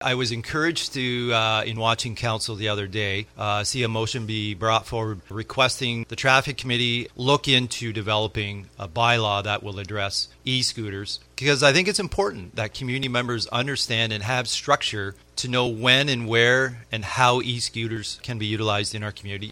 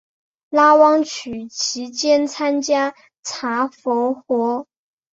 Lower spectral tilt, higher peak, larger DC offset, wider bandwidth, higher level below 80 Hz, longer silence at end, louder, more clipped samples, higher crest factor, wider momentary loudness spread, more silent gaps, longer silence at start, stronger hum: first, -3.5 dB/octave vs -2 dB/octave; about the same, -2 dBFS vs -2 dBFS; neither; first, 16 kHz vs 8 kHz; first, -50 dBFS vs -66 dBFS; second, 0 s vs 0.5 s; second, -23 LUFS vs -18 LUFS; neither; about the same, 22 dB vs 18 dB; about the same, 12 LU vs 14 LU; second, none vs 3.19-3.23 s; second, 0 s vs 0.5 s; neither